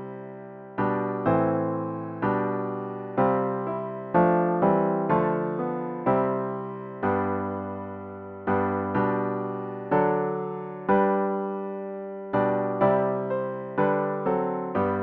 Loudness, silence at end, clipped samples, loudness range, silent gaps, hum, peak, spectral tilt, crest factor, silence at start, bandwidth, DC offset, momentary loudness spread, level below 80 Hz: -26 LUFS; 0 s; under 0.1%; 3 LU; none; none; -10 dBFS; -11 dB/octave; 16 dB; 0 s; 4.4 kHz; under 0.1%; 11 LU; -60 dBFS